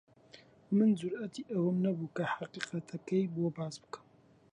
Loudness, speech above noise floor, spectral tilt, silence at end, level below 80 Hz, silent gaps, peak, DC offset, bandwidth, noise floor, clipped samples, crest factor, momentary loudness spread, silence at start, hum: -34 LUFS; 26 dB; -7 dB/octave; 0.55 s; -78 dBFS; none; -16 dBFS; under 0.1%; 10.5 kHz; -59 dBFS; under 0.1%; 18 dB; 13 LU; 0.35 s; none